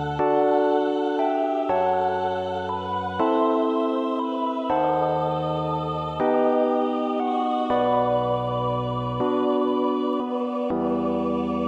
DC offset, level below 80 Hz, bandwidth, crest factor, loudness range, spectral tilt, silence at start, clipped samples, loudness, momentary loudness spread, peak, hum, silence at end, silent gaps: under 0.1%; -52 dBFS; 8 kHz; 14 dB; 1 LU; -8 dB/octave; 0 s; under 0.1%; -24 LUFS; 5 LU; -10 dBFS; none; 0 s; none